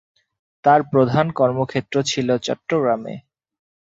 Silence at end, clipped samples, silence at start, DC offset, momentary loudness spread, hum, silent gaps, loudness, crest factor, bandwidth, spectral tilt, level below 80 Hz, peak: 0.75 s; under 0.1%; 0.65 s; under 0.1%; 8 LU; none; none; -19 LUFS; 18 dB; 8 kHz; -5.5 dB/octave; -58 dBFS; -2 dBFS